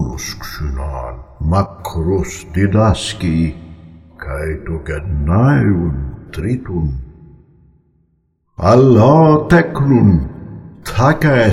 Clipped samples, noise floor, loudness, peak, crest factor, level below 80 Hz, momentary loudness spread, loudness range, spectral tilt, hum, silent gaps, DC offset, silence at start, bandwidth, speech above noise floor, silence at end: under 0.1%; -61 dBFS; -15 LUFS; 0 dBFS; 14 dB; -28 dBFS; 17 LU; 6 LU; -7 dB/octave; none; none; under 0.1%; 0 s; 14.5 kHz; 48 dB; 0 s